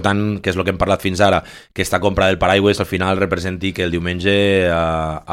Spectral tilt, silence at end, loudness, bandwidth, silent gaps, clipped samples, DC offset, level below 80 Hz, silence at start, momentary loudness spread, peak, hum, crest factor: -5.5 dB/octave; 0 s; -17 LUFS; 16.5 kHz; none; under 0.1%; under 0.1%; -38 dBFS; 0 s; 7 LU; 0 dBFS; none; 16 dB